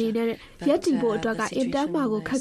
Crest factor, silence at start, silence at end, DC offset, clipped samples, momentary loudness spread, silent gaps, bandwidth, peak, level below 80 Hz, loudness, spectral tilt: 14 dB; 0 s; 0 s; under 0.1%; under 0.1%; 5 LU; none; 13.5 kHz; -10 dBFS; -54 dBFS; -25 LUFS; -5 dB/octave